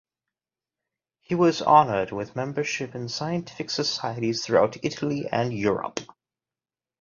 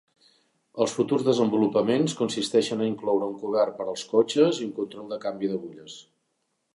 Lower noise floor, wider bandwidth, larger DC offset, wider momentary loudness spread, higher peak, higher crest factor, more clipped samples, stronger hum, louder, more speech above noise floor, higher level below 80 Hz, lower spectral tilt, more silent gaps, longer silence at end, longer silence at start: first, under -90 dBFS vs -76 dBFS; second, 7.4 kHz vs 11.5 kHz; neither; about the same, 12 LU vs 12 LU; first, -4 dBFS vs -8 dBFS; about the same, 22 dB vs 18 dB; neither; neither; about the same, -25 LUFS vs -25 LUFS; first, over 66 dB vs 51 dB; first, -62 dBFS vs -72 dBFS; about the same, -5 dB/octave vs -5.5 dB/octave; neither; first, 0.95 s vs 0.75 s; first, 1.3 s vs 0.75 s